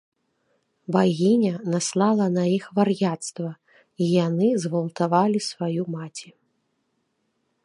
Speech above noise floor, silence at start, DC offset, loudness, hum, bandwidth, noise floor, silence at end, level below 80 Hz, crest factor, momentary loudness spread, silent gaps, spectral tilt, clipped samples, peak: 51 dB; 0.9 s; under 0.1%; -23 LUFS; none; 11.5 kHz; -73 dBFS; 1.4 s; -72 dBFS; 18 dB; 13 LU; none; -6 dB/octave; under 0.1%; -4 dBFS